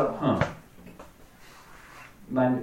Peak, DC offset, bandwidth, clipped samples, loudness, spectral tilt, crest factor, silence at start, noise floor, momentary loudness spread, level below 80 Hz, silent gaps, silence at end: -10 dBFS; under 0.1%; 16 kHz; under 0.1%; -27 LUFS; -7.5 dB/octave; 20 dB; 0 s; -51 dBFS; 25 LU; -54 dBFS; none; 0 s